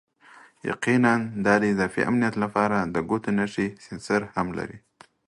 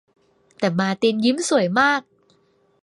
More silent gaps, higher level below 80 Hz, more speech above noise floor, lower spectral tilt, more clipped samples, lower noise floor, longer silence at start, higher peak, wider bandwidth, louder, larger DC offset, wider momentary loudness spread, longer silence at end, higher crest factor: neither; first, -56 dBFS vs -66 dBFS; second, 28 dB vs 42 dB; first, -6.5 dB/octave vs -4.5 dB/octave; neither; second, -52 dBFS vs -61 dBFS; second, 0.35 s vs 0.6 s; about the same, -4 dBFS vs -4 dBFS; about the same, 11.5 kHz vs 11.5 kHz; second, -24 LUFS vs -20 LUFS; neither; first, 11 LU vs 7 LU; second, 0.5 s vs 0.8 s; about the same, 20 dB vs 18 dB